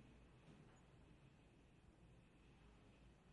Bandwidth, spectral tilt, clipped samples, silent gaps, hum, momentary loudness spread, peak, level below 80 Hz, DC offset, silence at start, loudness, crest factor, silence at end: 10 kHz; -6 dB/octave; under 0.1%; none; none; 3 LU; -54 dBFS; -74 dBFS; under 0.1%; 0 s; -69 LUFS; 14 dB; 0 s